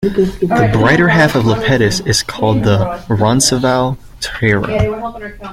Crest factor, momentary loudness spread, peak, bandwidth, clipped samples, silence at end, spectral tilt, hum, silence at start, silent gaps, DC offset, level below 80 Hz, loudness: 14 dB; 10 LU; 0 dBFS; 16 kHz; under 0.1%; 0 s; -5 dB/octave; none; 0 s; none; under 0.1%; -32 dBFS; -13 LUFS